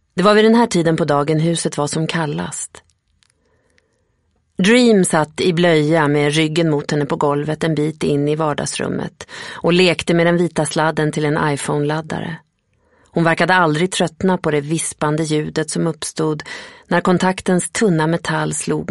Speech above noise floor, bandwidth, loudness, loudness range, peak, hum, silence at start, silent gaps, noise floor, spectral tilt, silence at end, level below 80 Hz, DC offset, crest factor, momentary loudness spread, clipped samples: 47 dB; 11.5 kHz; -17 LUFS; 4 LU; 0 dBFS; none; 0.15 s; none; -64 dBFS; -5 dB/octave; 0.05 s; -52 dBFS; under 0.1%; 18 dB; 10 LU; under 0.1%